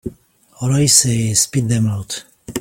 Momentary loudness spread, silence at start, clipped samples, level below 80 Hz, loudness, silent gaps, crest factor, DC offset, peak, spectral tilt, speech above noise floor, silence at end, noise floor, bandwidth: 17 LU; 0.05 s; under 0.1%; -46 dBFS; -15 LUFS; none; 18 dB; under 0.1%; 0 dBFS; -3.5 dB/octave; 33 dB; 0 s; -48 dBFS; 17 kHz